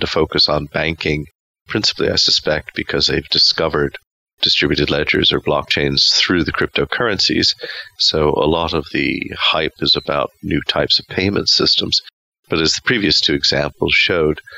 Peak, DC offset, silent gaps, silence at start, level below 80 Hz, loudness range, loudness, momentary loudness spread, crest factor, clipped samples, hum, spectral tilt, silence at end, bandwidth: -4 dBFS; under 0.1%; 1.35-1.54 s, 1.61-1.66 s, 4.11-4.26 s, 4.33-4.38 s, 12.13-12.32 s, 12.39-12.43 s; 0 s; -38 dBFS; 2 LU; -15 LUFS; 8 LU; 14 dB; under 0.1%; none; -3.5 dB/octave; 0 s; 15.5 kHz